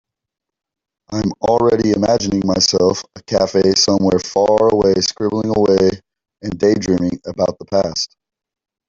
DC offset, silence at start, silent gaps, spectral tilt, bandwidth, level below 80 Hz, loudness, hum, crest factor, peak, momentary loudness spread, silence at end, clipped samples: under 0.1%; 1.1 s; none; -4.5 dB/octave; 7.8 kHz; -46 dBFS; -16 LUFS; none; 16 dB; -2 dBFS; 9 LU; 0.8 s; under 0.1%